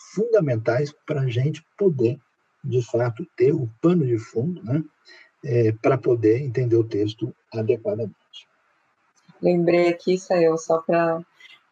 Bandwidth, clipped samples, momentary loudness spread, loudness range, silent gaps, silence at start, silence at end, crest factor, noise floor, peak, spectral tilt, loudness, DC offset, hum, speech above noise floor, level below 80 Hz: 7.8 kHz; under 0.1%; 8 LU; 2 LU; none; 0.15 s; 0.5 s; 16 dB; -66 dBFS; -8 dBFS; -8 dB/octave; -22 LUFS; under 0.1%; none; 44 dB; -74 dBFS